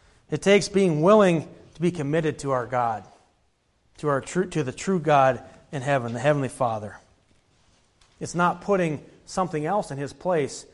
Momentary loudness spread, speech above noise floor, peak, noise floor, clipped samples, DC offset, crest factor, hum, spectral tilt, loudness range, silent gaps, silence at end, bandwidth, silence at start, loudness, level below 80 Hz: 14 LU; 44 dB; -6 dBFS; -67 dBFS; under 0.1%; under 0.1%; 20 dB; none; -6 dB/octave; 6 LU; none; 0.1 s; 11.5 kHz; 0.3 s; -24 LUFS; -58 dBFS